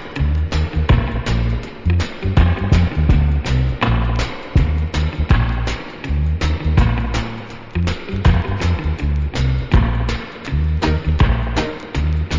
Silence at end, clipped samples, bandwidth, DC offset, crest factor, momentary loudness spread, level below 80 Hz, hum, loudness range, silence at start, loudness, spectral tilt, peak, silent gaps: 0 s; under 0.1%; 7.6 kHz; under 0.1%; 16 dB; 7 LU; -20 dBFS; none; 2 LU; 0 s; -19 LUFS; -7 dB/octave; 0 dBFS; none